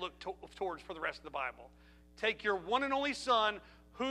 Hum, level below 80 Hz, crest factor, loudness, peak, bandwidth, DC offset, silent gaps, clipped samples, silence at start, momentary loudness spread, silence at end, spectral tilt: none; -62 dBFS; 20 dB; -36 LUFS; -18 dBFS; 13.5 kHz; under 0.1%; none; under 0.1%; 0 s; 11 LU; 0 s; -3 dB/octave